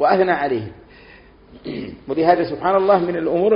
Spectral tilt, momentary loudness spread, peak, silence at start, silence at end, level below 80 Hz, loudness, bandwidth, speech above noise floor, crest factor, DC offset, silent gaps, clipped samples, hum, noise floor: -5 dB/octave; 15 LU; -2 dBFS; 0 s; 0 s; -52 dBFS; -18 LUFS; 5.4 kHz; 28 dB; 16 dB; under 0.1%; none; under 0.1%; none; -46 dBFS